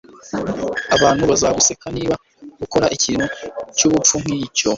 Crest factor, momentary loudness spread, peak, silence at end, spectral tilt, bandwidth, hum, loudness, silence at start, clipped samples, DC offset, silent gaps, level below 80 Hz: 18 dB; 12 LU; 0 dBFS; 0 s; -3 dB/octave; 7.8 kHz; none; -17 LUFS; 0.15 s; under 0.1%; under 0.1%; none; -44 dBFS